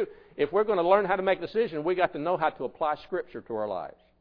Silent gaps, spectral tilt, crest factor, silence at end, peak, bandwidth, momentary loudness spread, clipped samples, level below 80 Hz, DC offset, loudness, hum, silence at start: none; -8.5 dB/octave; 20 dB; 0.3 s; -8 dBFS; 5.4 kHz; 12 LU; under 0.1%; -60 dBFS; under 0.1%; -28 LUFS; none; 0 s